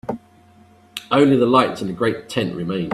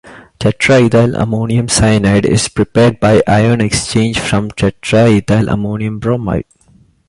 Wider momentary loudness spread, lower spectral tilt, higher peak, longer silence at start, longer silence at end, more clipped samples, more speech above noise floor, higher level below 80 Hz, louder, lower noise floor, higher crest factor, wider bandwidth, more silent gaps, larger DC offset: first, 19 LU vs 7 LU; about the same, -6.5 dB/octave vs -5.5 dB/octave; about the same, -2 dBFS vs 0 dBFS; about the same, 0.05 s vs 0.05 s; second, 0 s vs 0.65 s; neither; second, 32 dB vs 37 dB; second, -56 dBFS vs -34 dBFS; second, -18 LUFS vs -12 LUFS; about the same, -50 dBFS vs -48 dBFS; first, 18 dB vs 12 dB; first, 13.5 kHz vs 11.5 kHz; neither; neither